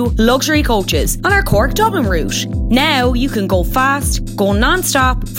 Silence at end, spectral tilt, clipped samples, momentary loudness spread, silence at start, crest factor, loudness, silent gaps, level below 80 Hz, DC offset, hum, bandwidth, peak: 0 s; -4.5 dB/octave; under 0.1%; 5 LU; 0 s; 14 dB; -14 LUFS; none; -22 dBFS; under 0.1%; none; 17 kHz; 0 dBFS